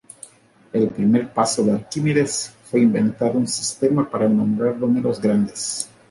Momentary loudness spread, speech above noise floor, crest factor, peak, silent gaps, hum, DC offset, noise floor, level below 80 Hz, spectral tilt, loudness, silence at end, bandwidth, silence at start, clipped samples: 7 LU; 26 dB; 16 dB; -4 dBFS; none; none; under 0.1%; -46 dBFS; -58 dBFS; -5.5 dB/octave; -20 LUFS; 0.25 s; 11.5 kHz; 0.75 s; under 0.1%